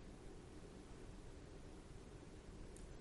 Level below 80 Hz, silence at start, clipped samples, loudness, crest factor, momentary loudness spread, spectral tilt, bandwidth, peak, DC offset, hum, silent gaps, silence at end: -60 dBFS; 0 s; under 0.1%; -59 LUFS; 14 dB; 1 LU; -5.5 dB/octave; 11.5 kHz; -42 dBFS; under 0.1%; none; none; 0 s